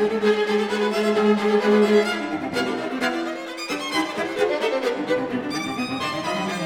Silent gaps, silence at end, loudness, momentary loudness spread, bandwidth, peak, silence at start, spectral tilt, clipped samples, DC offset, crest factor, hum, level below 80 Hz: none; 0 s; -22 LUFS; 8 LU; 15.5 kHz; -6 dBFS; 0 s; -4.5 dB/octave; under 0.1%; under 0.1%; 16 dB; none; -66 dBFS